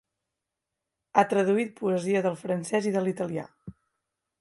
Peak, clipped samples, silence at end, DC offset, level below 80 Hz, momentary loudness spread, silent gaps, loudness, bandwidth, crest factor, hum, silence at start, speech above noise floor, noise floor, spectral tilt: -6 dBFS; under 0.1%; 0.7 s; under 0.1%; -70 dBFS; 9 LU; none; -27 LUFS; 11.5 kHz; 22 dB; none; 1.15 s; 60 dB; -86 dBFS; -6 dB/octave